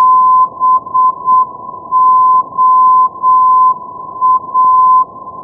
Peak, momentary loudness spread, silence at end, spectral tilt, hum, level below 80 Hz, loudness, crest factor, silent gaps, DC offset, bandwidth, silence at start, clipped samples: -2 dBFS; 9 LU; 0 s; -13 dB/octave; none; -58 dBFS; -9 LUFS; 8 dB; none; under 0.1%; 1.3 kHz; 0 s; under 0.1%